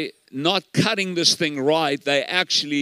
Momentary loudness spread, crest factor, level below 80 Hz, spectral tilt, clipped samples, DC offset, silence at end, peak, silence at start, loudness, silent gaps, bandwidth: 4 LU; 20 dB; -74 dBFS; -3 dB/octave; under 0.1%; under 0.1%; 0 s; -2 dBFS; 0 s; -20 LUFS; none; 16 kHz